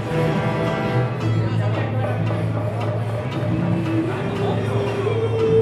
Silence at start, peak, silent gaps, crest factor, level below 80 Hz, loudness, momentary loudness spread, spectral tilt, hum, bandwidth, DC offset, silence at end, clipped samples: 0 s; -6 dBFS; none; 14 dB; -46 dBFS; -22 LUFS; 3 LU; -8 dB/octave; none; 11.5 kHz; under 0.1%; 0 s; under 0.1%